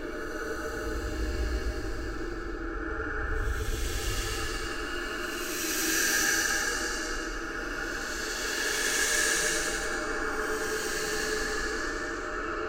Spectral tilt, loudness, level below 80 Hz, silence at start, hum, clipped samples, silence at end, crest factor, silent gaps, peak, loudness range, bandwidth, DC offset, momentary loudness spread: -2 dB/octave; -30 LUFS; -38 dBFS; 0 s; none; under 0.1%; 0 s; 18 dB; none; -12 dBFS; 6 LU; 16 kHz; under 0.1%; 10 LU